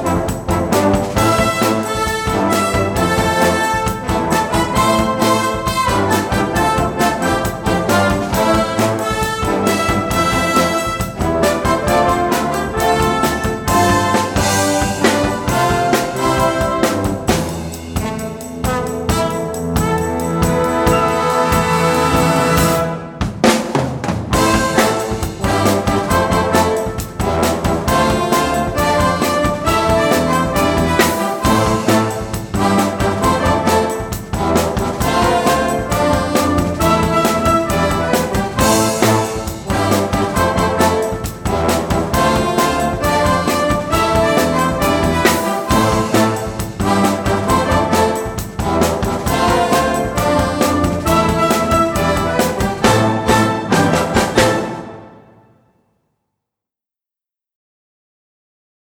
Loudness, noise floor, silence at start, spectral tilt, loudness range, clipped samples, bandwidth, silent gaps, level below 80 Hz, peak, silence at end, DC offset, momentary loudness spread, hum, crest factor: -15 LUFS; -89 dBFS; 0 s; -5 dB/octave; 2 LU; under 0.1%; over 20 kHz; none; -30 dBFS; 0 dBFS; 3.8 s; under 0.1%; 5 LU; none; 16 dB